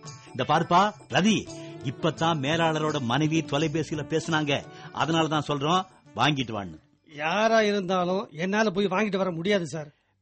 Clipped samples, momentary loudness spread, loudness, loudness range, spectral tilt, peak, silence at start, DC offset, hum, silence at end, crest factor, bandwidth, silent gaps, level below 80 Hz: under 0.1%; 13 LU; -26 LUFS; 2 LU; -5 dB/octave; -10 dBFS; 0.05 s; under 0.1%; none; 0.35 s; 16 dB; 8.4 kHz; none; -60 dBFS